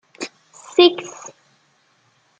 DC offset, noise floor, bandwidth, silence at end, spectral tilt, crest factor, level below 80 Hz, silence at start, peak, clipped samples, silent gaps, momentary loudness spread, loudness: under 0.1%; -61 dBFS; 8.6 kHz; 1.3 s; -2.5 dB/octave; 20 dB; -74 dBFS; 0.2 s; -2 dBFS; under 0.1%; none; 24 LU; -16 LUFS